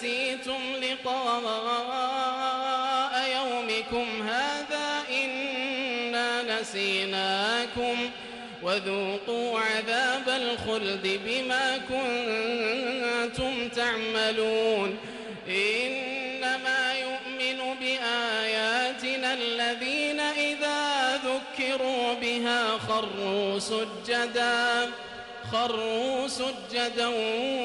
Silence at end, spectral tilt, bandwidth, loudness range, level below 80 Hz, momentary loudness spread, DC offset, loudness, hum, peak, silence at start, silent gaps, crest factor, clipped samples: 0 s; -2.5 dB/octave; 11.5 kHz; 1 LU; -62 dBFS; 5 LU; under 0.1%; -27 LUFS; none; -16 dBFS; 0 s; none; 14 dB; under 0.1%